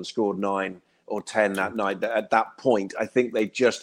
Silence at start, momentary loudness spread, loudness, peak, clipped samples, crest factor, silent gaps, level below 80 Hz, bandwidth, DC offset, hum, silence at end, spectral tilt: 0 s; 6 LU; -25 LUFS; -6 dBFS; under 0.1%; 20 dB; none; -68 dBFS; 16 kHz; under 0.1%; none; 0 s; -4.5 dB/octave